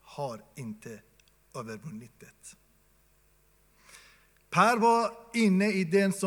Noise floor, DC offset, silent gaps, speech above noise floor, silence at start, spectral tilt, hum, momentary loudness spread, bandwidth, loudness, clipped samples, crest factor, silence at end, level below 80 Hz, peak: -65 dBFS; under 0.1%; none; 37 dB; 0.1 s; -5.5 dB/octave; none; 23 LU; 17.5 kHz; -26 LUFS; under 0.1%; 22 dB; 0 s; -70 dBFS; -8 dBFS